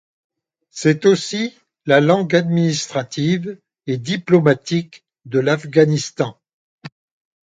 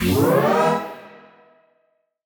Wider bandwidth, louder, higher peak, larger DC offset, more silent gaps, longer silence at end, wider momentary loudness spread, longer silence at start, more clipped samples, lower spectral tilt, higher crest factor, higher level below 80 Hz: second, 9.2 kHz vs over 20 kHz; about the same, -18 LUFS vs -18 LUFS; first, 0 dBFS vs -6 dBFS; neither; first, 6.54-6.78 s vs none; second, 0.6 s vs 1.15 s; second, 12 LU vs 18 LU; first, 0.75 s vs 0 s; neither; about the same, -5.5 dB/octave vs -6 dB/octave; about the same, 18 dB vs 16 dB; second, -62 dBFS vs -50 dBFS